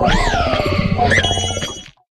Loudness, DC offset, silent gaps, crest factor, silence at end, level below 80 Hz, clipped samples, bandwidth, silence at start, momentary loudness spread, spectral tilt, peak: -16 LUFS; under 0.1%; none; 16 dB; 0.3 s; -26 dBFS; under 0.1%; 12.5 kHz; 0 s; 11 LU; -4 dB/octave; 0 dBFS